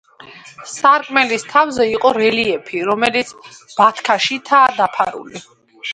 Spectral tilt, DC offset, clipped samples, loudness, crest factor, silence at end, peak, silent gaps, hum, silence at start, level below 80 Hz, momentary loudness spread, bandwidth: -3 dB/octave; under 0.1%; under 0.1%; -15 LUFS; 16 dB; 0 s; 0 dBFS; none; none; 0.25 s; -58 dBFS; 17 LU; 11.5 kHz